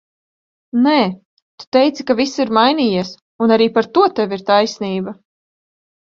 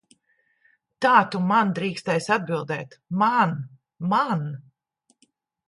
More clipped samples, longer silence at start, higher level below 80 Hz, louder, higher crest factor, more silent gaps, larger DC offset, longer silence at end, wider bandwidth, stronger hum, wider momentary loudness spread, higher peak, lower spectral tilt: neither; second, 0.75 s vs 1 s; first, -60 dBFS vs -70 dBFS; first, -16 LUFS vs -23 LUFS; second, 16 dB vs 22 dB; first, 1.25-1.58 s, 1.67-1.72 s, 3.21-3.39 s vs none; neither; about the same, 1 s vs 1.05 s; second, 7.6 kHz vs 11.5 kHz; neither; second, 9 LU vs 14 LU; first, 0 dBFS vs -4 dBFS; about the same, -5.5 dB/octave vs -6 dB/octave